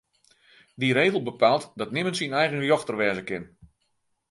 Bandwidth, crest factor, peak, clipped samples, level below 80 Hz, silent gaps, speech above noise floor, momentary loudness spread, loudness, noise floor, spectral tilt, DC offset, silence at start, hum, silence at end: 11.5 kHz; 22 dB; -6 dBFS; under 0.1%; -66 dBFS; none; 49 dB; 9 LU; -25 LUFS; -73 dBFS; -5 dB/octave; under 0.1%; 0.8 s; none; 0.85 s